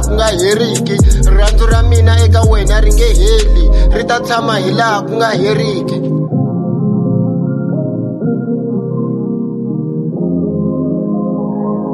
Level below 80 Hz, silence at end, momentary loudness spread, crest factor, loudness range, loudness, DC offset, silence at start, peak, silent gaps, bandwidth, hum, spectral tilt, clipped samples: -14 dBFS; 0 s; 7 LU; 10 dB; 6 LU; -13 LUFS; under 0.1%; 0 s; 0 dBFS; none; 13 kHz; none; -6 dB/octave; under 0.1%